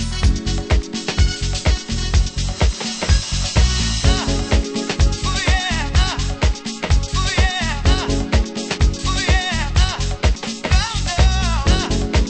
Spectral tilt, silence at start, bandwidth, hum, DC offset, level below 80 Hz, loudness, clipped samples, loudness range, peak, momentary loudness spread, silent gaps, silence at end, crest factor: -4 dB/octave; 0 s; 9.2 kHz; none; under 0.1%; -20 dBFS; -19 LUFS; under 0.1%; 1 LU; -2 dBFS; 3 LU; none; 0 s; 16 dB